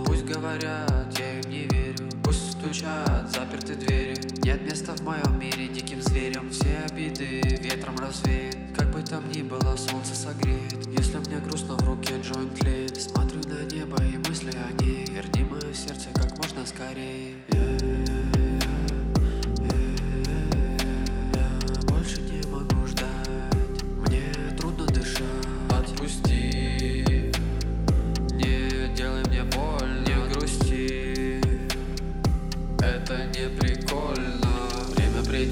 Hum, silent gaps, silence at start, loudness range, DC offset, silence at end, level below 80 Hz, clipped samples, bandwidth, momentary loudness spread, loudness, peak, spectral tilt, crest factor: none; none; 0 s; 2 LU; under 0.1%; 0 s; -30 dBFS; under 0.1%; 16.5 kHz; 6 LU; -28 LUFS; -8 dBFS; -5.5 dB/octave; 16 dB